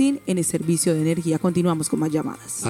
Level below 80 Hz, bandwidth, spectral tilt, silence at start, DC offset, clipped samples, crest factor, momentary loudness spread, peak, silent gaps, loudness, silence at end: -58 dBFS; 16 kHz; -5.5 dB/octave; 0 s; under 0.1%; under 0.1%; 12 dB; 4 LU; -10 dBFS; none; -22 LUFS; 0 s